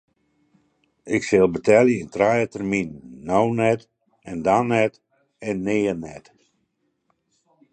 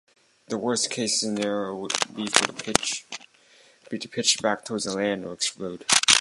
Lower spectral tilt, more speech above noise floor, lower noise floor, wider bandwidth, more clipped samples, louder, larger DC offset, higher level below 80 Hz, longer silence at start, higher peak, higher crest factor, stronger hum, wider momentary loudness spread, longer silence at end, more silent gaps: first, -6.5 dB/octave vs -1.5 dB/octave; first, 51 dB vs 30 dB; first, -72 dBFS vs -57 dBFS; second, 9.2 kHz vs 16 kHz; neither; first, -21 LUFS vs -24 LUFS; neither; about the same, -56 dBFS vs -60 dBFS; first, 1.05 s vs 0.5 s; about the same, -2 dBFS vs 0 dBFS; second, 20 dB vs 26 dB; neither; first, 15 LU vs 11 LU; first, 1.55 s vs 0 s; neither